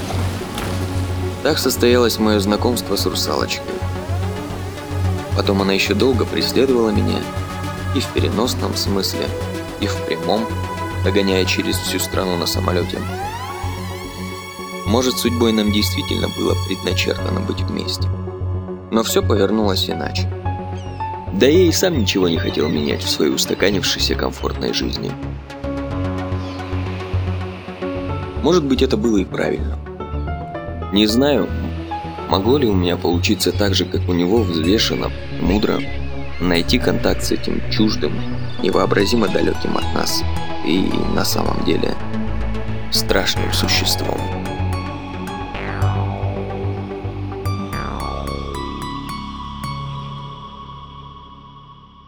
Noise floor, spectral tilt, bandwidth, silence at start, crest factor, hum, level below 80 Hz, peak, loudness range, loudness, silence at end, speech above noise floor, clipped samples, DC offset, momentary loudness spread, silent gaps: -42 dBFS; -5 dB/octave; over 20 kHz; 0 s; 18 dB; none; -34 dBFS; 0 dBFS; 6 LU; -19 LUFS; 0 s; 24 dB; under 0.1%; under 0.1%; 11 LU; none